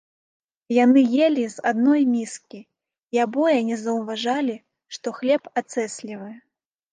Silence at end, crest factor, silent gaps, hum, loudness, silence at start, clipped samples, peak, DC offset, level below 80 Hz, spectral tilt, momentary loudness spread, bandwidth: 0.55 s; 16 dB; 3.03-3.08 s; none; -21 LUFS; 0.7 s; under 0.1%; -6 dBFS; under 0.1%; -78 dBFS; -4.5 dB/octave; 18 LU; 9.6 kHz